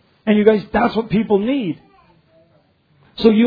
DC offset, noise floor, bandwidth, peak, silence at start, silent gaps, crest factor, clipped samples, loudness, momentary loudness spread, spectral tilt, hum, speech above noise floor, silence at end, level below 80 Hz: under 0.1%; -57 dBFS; 5 kHz; 0 dBFS; 0.25 s; none; 18 dB; under 0.1%; -17 LUFS; 13 LU; -9 dB/octave; none; 42 dB; 0 s; -46 dBFS